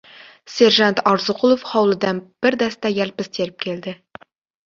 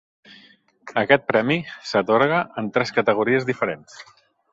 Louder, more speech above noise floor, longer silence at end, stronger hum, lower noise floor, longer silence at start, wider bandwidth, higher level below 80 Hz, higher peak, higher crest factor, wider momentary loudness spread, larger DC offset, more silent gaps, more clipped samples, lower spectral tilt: first, -18 LUFS vs -21 LUFS; second, 26 dB vs 33 dB; first, 0.75 s vs 0.5 s; neither; second, -44 dBFS vs -54 dBFS; second, 0.5 s vs 0.85 s; about the same, 7.6 kHz vs 7.8 kHz; about the same, -62 dBFS vs -62 dBFS; about the same, -2 dBFS vs -2 dBFS; about the same, 18 dB vs 20 dB; first, 13 LU vs 8 LU; neither; neither; neither; second, -4.5 dB/octave vs -6 dB/octave